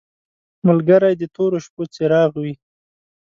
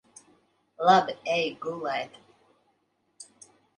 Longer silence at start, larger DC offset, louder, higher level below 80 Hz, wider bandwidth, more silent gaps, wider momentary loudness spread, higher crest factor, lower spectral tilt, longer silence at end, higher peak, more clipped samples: second, 0.65 s vs 0.8 s; neither; first, -17 LUFS vs -26 LUFS; first, -62 dBFS vs -76 dBFS; second, 7.4 kHz vs 10.5 kHz; first, 1.70-1.77 s vs none; second, 15 LU vs 26 LU; second, 18 dB vs 24 dB; first, -8 dB/octave vs -4 dB/octave; first, 0.7 s vs 0.55 s; first, 0 dBFS vs -6 dBFS; neither